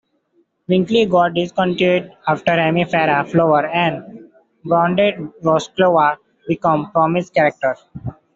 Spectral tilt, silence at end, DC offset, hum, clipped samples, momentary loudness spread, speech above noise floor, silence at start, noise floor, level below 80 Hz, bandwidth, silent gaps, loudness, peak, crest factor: -6.5 dB/octave; 0.25 s; under 0.1%; none; under 0.1%; 8 LU; 45 dB; 0.7 s; -62 dBFS; -56 dBFS; 7.8 kHz; none; -17 LUFS; 0 dBFS; 16 dB